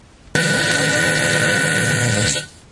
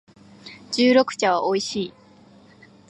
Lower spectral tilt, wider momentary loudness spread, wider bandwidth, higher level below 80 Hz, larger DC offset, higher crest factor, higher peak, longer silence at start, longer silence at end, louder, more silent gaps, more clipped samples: about the same, -3 dB/octave vs -4 dB/octave; second, 4 LU vs 20 LU; about the same, 11.5 kHz vs 11 kHz; first, -48 dBFS vs -68 dBFS; neither; about the same, 16 dB vs 18 dB; first, -2 dBFS vs -6 dBFS; about the same, 0.35 s vs 0.45 s; second, 0.2 s vs 1 s; first, -16 LUFS vs -21 LUFS; neither; neither